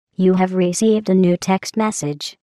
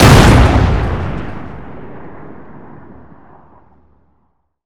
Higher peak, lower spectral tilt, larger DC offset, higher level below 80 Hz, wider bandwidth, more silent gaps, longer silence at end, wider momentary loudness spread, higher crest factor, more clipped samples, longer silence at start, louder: second, -4 dBFS vs 0 dBFS; about the same, -6 dB/octave vs -6 dB/octave; neither; second, -62 dBFS vs -20 dBFS; second, 12.5 kHz vs over 20 kHz; neither; second, 0.2 s vs 2.35 s; second, 8 LU vs 28 LU; about the same, 12 dB vs 14 dB; second, under 0.1% vs 1%; first, 0.2 s vs 0 s; second, -17 LUFS vs -11 LUFS